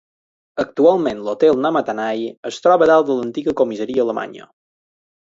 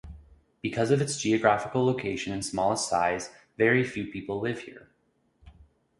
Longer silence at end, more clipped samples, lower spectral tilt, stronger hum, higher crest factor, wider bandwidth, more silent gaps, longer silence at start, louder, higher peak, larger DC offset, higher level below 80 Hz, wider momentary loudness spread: first, 0.8 s vs 0.5 s; neither; about the same, -6 dB/octave vs -5 dB/octave; neither; second, 16 dB vs 24 dB; second, 7.8 kHz vs 11.5 kHz; first, 2.37-2.43 s vs none; first, 0.55 s vs 0.05 s; first, -17 LUFS vs -27 LUFS; first, -2 dBFS vs -6 dBFS; neither; about the same, -60 dBFS vs -56 dBFS; about the same, 12 LU vs 11 LU